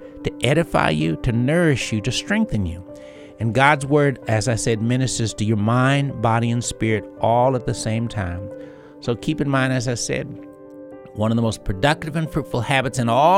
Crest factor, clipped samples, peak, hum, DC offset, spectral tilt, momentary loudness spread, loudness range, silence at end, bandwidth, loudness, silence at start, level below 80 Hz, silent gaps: 20 dB; under 0.1%; 0 dBFS; none; under 0.1%; -5.5 dB/octave; 17 LU; 5 LU; 0 s; 14 kHz; -20 LUFS; 0 s; -40 dBFS; none